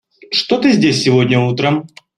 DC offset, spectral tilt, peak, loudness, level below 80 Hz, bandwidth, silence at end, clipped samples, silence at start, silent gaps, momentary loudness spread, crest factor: under 0.1%; -5.5 dB/octave; -2 dBFS; -14 LUFS; -54 dBFS; 10.5 kHz; 0.3 s; under 0.1%; 0.3 s; none; 6 LU; 12 dB